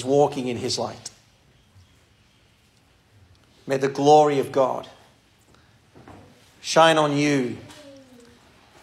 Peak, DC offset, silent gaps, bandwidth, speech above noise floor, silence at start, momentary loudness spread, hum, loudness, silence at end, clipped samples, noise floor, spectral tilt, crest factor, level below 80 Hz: -2 dBFS; under 0.1%; none; 13.5 kHz; 39 dB; 0 s; 23 LU; none; -21 LUFS; 0.9 s; under 0.1%; -59 dBFS; -4.5 dB/octave; 22 dB; -66 dBFS